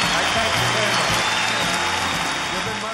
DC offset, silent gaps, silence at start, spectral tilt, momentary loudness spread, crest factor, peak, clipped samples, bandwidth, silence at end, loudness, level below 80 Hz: under 0.1%; none; 0 s; -2 dB/octave; 4 LU; 16 dB; -6 dBFS; under 0.1%; 16.5 kHz; 0 s; -19 LUFS; -44 dBFS